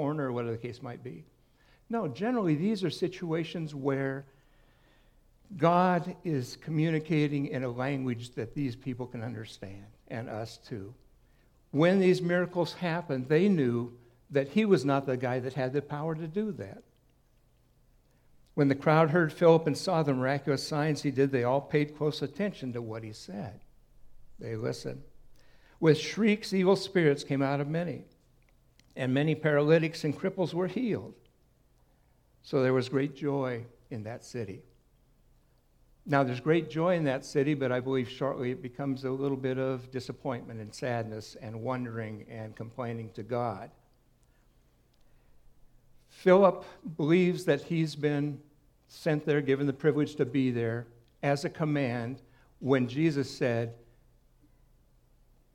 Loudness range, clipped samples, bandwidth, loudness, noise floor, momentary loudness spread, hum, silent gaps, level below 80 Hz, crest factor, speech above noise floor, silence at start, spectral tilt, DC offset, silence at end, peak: 9 LU; under 0.1%; 14 kHz; -30 LUFS; -66 dBFS; 16 LU; none; none; -64 dBFS; 22 dB; 36 dB; 0 s; -7 dB/octave; under 0.1%; 1.8 s; -8 dBFS